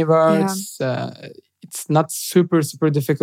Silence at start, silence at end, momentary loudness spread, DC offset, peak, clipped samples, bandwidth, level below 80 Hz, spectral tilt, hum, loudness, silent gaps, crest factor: 0 s; 0.05 s; 16 LU; under 0.1%; -2 dBFS; under 0.1%; 16.5 kHz; -74 dBFS; -6 dB/octave; none; -19 LUFS; none; 16 dB